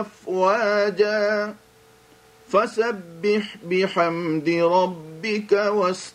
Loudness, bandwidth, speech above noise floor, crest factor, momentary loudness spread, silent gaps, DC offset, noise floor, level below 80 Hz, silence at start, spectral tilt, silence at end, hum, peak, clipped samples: -22 LUFS; 12 kHz; 31 dB; 16 dB; 7 LU; none; under 0.1%; -53 dBFS; -70 dBFS; 0 s; -5.5 dB/octave; 0.05 s; none; -6 dBFS; under 0.1%